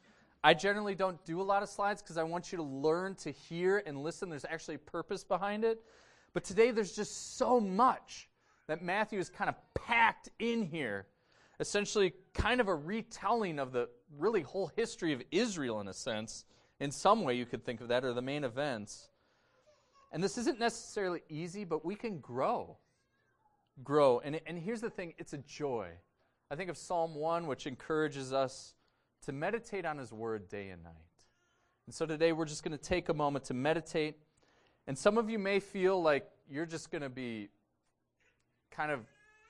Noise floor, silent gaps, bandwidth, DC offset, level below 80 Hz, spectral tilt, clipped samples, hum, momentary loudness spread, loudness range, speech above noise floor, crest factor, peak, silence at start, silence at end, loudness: -81 dBFS; none; 12 kHz; under 0.1%; -62 dBFS; -4.5 dB/octave; under 0.1%; none; 13 LU; 6 LU; 46 dB; 28 dB; -8 dBFS; 0.45 s; 0.45 s; -35 LUFS